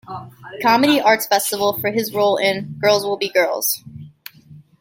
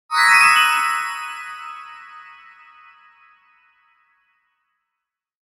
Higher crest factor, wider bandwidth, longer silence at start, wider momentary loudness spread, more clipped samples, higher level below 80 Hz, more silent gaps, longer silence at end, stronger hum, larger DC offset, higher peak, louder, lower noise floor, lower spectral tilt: about the same, 18 dB vs 20 dB; about the same, 17 kHz vs 16 kHz; about the same, 0.1 s vs 0.1 s; second, 20 LU vs 27 LU; neither; about the same, -62 dBFS vs -66 dBFS; neither; second, 0.2 s vs 3.2 s; neither; neither; about the same, -2 dBFS vs -2 dBFS; about the same, -17 LUFS vs -15 LUFS; second, -45 dBFS vs -83 dBFS; first, -3 dB/octave vs 2.5 dB/octave